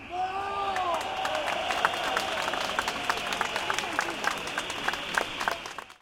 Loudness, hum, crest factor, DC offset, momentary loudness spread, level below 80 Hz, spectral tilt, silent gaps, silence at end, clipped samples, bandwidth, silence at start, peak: -29 LUFS; none; 24 dB; under 0.1%; 4 LU; -58 dBFS; -1.5 dB/octave; none; 0.05 s; under 0.1%; 17 kHz; 0 s; -6 dBFS